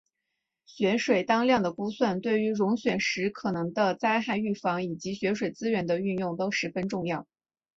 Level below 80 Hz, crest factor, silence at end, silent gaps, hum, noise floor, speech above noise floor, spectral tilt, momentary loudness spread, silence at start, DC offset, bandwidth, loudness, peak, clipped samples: -66 dBFS; 18 dB; 0.55 s; none; none; -83 dBFS; 56 dB; -5.5 dB/octave; 7 LU; 0.7 s; under 0.1%; 7.8 kHz; -28 LUFS; -10 dBFS; under 0.1%